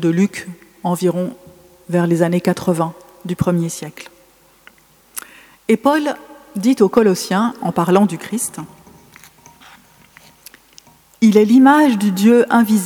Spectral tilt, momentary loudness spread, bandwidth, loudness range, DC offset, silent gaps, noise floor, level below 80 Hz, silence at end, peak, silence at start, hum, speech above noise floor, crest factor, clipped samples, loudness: -6 dB/octave; 20 LU; 19 kHz; 7 LU; under 0.1%; none; -51 dBFS; -56 dBFS; 0 s; 0 dBFS; 0 s; none; 36 dB; 16 dB; under 0.1%; -15 LUFS